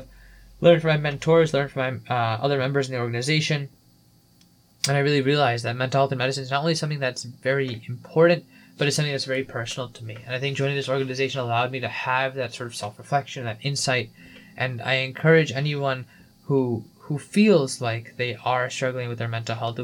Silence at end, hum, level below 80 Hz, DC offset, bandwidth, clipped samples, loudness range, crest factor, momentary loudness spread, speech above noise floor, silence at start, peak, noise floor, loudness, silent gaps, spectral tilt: 0 s; none; -60 dBFS; under 0.1%; 17.5 kHz; under 0.1%; 4 LU; 20 dB; 11 LU; 34 dB; 0 s; -4 dBFS; -57 dBFS; -24 LUFS; none; -5 dB/octave